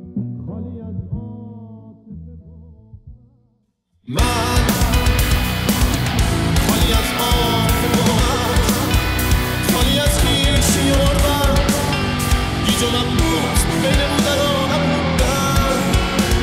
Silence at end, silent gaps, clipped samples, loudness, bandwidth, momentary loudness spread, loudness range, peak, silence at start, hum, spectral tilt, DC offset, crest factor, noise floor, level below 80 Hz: 0 s; none; under 0.1%; -17 LUFS; 16.5 kHz; 13 LU; 12 LU; -4 dBFS; 0 s; none; -4.5 dB/octave; under 0.1%; 14 dB; -64 dBFS; -22 dBFS